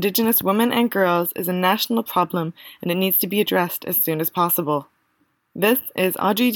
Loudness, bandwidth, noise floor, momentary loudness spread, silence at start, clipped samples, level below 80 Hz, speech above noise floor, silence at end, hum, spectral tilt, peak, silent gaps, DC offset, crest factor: -20 LUFS; 17.5 kHz; -67 dBFS; 8 LU; 0 s; under 0.1%; -68 dBFS; 46 dB; 0 s; none; -4.5 dB/octave; -6 dBFS; none; under 0.1%; 16 dB